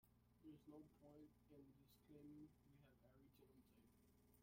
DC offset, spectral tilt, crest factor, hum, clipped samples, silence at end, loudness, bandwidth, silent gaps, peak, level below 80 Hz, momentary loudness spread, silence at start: under 0.1%; -7 dB/octave; 16 dB; none; under 0.1%; 0 s; -67 LUFS; 16 kHz; none; -54 dBFS; -84 dBFS; 5 LU; 0 s